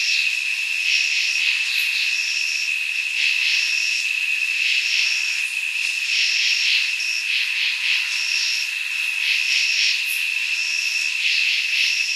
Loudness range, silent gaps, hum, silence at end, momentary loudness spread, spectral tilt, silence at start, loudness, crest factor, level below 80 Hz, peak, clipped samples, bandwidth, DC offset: 1 LU; none; none; 0 s; 4 LU; 10 dB/octave; 0 s; -18 LUFS; 16 dB; under -90 dBFS; -6 dBFS; under 0.1%; 15 kHz; under 0.1%